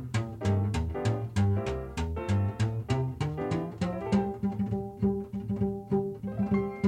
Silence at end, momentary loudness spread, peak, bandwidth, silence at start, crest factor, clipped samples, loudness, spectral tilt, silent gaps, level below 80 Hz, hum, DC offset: 0 s; 5 LU; -14 dBFS; 10 kHz; 0 s; 16 dB; under 0.1%; -31 LUFS; -8 dB/octave; none; -44 dBFS; none; under 0.1%